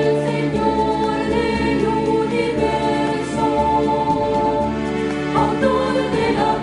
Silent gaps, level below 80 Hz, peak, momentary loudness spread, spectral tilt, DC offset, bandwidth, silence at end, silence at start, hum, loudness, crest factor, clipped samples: none; -38 dBFS; -4 dBFS; 3 LU; -6.5 dB/octave; under 0.1%; 11 kHz; 0 s; 0 s; none; -19 LUFS; 14 dB; under 0.1%